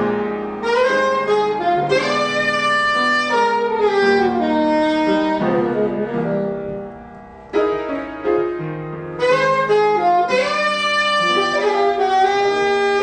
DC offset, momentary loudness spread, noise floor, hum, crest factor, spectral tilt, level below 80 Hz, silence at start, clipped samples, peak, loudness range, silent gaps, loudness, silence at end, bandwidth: under 0.1%; 8 LU; -38 dBFS; none; 12 dB; -4.5 dB/octave; -50 dBFS; 0 s; under 0.1%; -4 dBFS; 5 LU; none; -17 LUFS; 0 s; 9.4 kHz